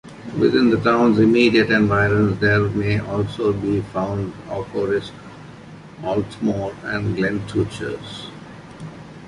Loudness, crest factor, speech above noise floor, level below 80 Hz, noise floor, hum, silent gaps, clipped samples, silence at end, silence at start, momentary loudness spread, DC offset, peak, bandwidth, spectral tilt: -19 LUFS; 18 dB; 21 dB; -44 dBFS; -40 dBFS; none; none; under 0.1%; 0 s; 0.05 s; 22 LU; under 0.1%; -2 dBFS; 11.5 kHz; -7 dB/octave